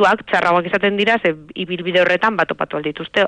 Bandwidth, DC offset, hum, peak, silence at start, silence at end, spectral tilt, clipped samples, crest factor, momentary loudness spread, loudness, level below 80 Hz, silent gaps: 10 kHz; under 0.1%; none; -4 dBFS; 0 s; 0 s; -5.5 dB/octave; under 0.1%; 14 dB; 8 LU; -17 LUFS; -56 dBFS; none